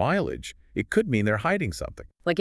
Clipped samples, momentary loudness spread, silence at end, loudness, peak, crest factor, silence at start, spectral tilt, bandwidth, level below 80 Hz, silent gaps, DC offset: under 0.1%; 12 LU; 0 s; -26 LUFS; -10 dBFS; 16 dB; 0 s; -6 dB/octave; 12 kHz; -48 dBFS; none; under 0.1%